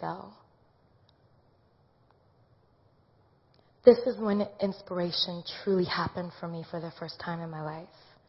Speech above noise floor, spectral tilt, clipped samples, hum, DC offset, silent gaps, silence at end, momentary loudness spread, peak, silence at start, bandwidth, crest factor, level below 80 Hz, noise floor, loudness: 36 dB; -8.5 dB/octave; under 0.1%; none; under 0.1%; none; 0.4 s; 18 LU; -4 dBFS; 0 s; 6 kHz; 28 dB; -64 dBFS; -65 dBFS; -29 LUFS